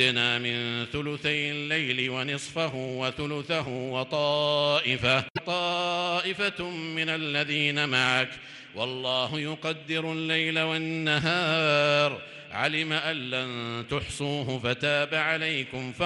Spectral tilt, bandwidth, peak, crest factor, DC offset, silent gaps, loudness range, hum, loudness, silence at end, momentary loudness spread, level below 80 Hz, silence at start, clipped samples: -4.5 dB/octave; 11.5 kHz; -10 dBFS; 18 dB; under 0.1%; 5.30-5.35 s; 3 LU; none; -27 LUFS; 0 s; 8 LU; -60 dBFS; 0 s; under 0.1%